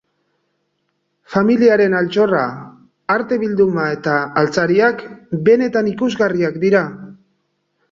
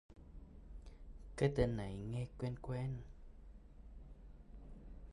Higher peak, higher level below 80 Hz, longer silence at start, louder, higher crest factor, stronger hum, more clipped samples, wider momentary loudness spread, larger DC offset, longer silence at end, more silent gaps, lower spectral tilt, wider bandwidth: first, -2 dBFS vs -22 dBFS; about the same, -58 dBFS vs -54 dBFS; first, 1.3 s vs 0.1 s; first, -16 LUFS vs -41 LUFS; second, 16 dB vs 22 dB; neither; neither; second, 12 LU vs 23 LU; neither; first, 0.75 s vs 0 s; neither; about the same, -7 dB/octave vs -7.5 dB/octave; second, 7.6 kHz vs 11 kHz